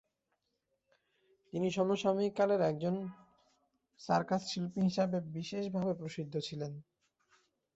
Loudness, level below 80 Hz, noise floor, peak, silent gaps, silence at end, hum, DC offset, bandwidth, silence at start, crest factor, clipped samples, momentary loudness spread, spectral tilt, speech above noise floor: -35 LUFS; -74 dBFS; -83 dBFS; -18 dBFS; none; 0.95 s; none; under 0.1%; 8 kHz; 1.55 s; 20 dB; under 0.1%; 12 LU; -6 dB/octave; 49 dB